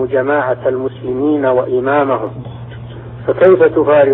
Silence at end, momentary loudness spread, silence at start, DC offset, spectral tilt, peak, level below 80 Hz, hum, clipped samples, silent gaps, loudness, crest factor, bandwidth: 0 s; 20 LU; 0 s; under 0.1%; -6 dB/octave; 0 dBFS; -46 dBFS; none; under 0.1%; none; -13 LUFS; 12 dB; 4 kHz